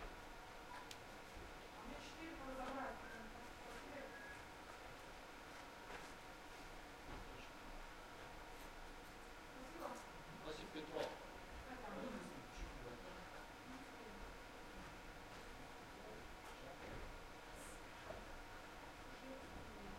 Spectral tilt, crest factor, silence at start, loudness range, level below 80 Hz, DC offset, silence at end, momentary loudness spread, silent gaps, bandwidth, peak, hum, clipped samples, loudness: -4 dB/octave; 22 dB; 0 s; 4 LU; -62 dBFS; under 0.1%; 0 s; 6 LU; none; 16 kHz; -32 dBFS; none; under 0.1%; -54 LUFS